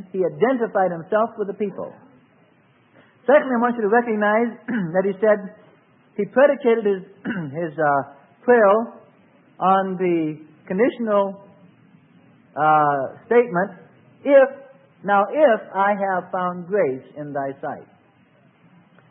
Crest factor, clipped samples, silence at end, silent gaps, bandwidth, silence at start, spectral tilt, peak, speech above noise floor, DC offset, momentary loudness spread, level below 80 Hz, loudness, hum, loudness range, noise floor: 18 dB; under 0.1%; 1.3 s; none; 3.8 kHz; 0 s; -11.5 dB/octave; -2 dBFS; 38 dB; under 0.1%; 13 LU; -76 dBFS; -20 LUFS; none; 4 LU; -57 dBFS